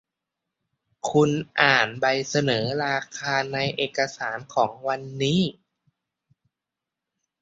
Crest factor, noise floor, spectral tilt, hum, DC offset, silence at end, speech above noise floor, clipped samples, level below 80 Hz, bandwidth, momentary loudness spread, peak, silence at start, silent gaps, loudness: 24 dB; -87 dBFS; -4.5 dB/octave; none; under 0.1%; 1.9 s; 63 dB; under 0.1%; -62 dBFS; 8 kHz; 9 LU; -2 dBFS; 1.05 s; none; -24 LUFS